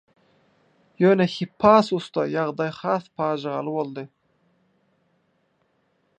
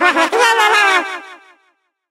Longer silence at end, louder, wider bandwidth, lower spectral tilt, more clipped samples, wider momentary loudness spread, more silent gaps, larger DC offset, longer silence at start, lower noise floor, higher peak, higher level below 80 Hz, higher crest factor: first, 2.1 s vs 0.75 s; second, -22 LUFS vs -12 LUFS; second, 9 kHz vs 16 kHz; first, -7 dB/octave vs 0.5 dB/octave; neither; about the same, 12 LU vs 14 LU; neither; neither; first, 1 s vs 0 s; first, -68 dBFS vs -62 dBFS; about the same, -2 dBFS vs 0 dBFS; first, -62 dBFS vs -70 dBFS; first, 22 dB vs 16 dB